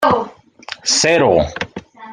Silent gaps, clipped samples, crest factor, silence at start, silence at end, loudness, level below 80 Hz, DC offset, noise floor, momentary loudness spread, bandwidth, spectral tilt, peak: none; under 0.1%; 16 dB; 0 s; 0 s; -15 LUFS; -42 dBFS; under 0.1%; -35 dBFS; 19 LU; 15 kHz; -3 dB/octave; -2 dBFS